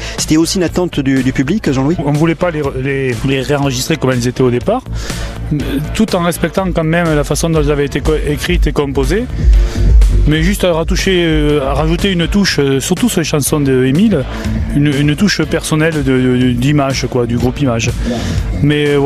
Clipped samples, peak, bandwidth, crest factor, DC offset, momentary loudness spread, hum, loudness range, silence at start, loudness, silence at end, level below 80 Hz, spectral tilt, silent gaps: under 0.1%; 0 dBFS; 14.5 kHz; 12 dB; under 0.1%; 5 LU; none; 3 LU; 0 s; -13 LUFS; 0 s; -20 dBFS; -5.5 dB/octave; none